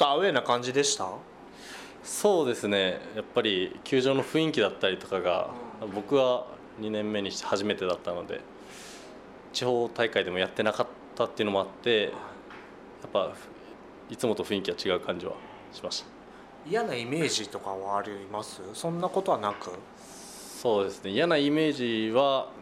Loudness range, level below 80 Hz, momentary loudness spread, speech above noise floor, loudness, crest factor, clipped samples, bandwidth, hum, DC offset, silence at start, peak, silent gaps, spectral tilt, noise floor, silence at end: 5 LU; -66 dBFS; 20 LU; 20 dB; -29 LUFS; 20 dB; under 0.1%; 15.5 kHz; none; under 0.1%; 0 s; -10 dBFS; none; -4 dB/octave; -49 dBFS; 0 s